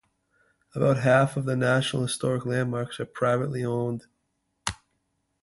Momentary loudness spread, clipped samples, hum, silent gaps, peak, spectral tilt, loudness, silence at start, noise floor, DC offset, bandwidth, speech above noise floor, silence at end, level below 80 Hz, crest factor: 13 LU; under 0.1%; none; none; -8 dBFS; -5.5 dB/octave; -26 LUFS; 0.75 s; -76 dBFS; under 0.1%; 11.5 kHz; 51 dB; 0.65 s; -58 dBFS; 18 dB